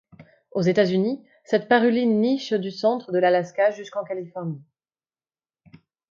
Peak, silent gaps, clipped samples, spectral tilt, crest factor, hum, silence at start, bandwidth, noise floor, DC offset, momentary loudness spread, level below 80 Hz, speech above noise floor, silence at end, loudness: -6 dBFS; none; under 0.1%; -6.5 dB/octave; 18 dB; none; 0.2 s; 7.4 kHz; under -90 dBFS; under 0.1%; 13 LU; -72 dBFS; over 68 dB; 1.5 s; -23 LUFS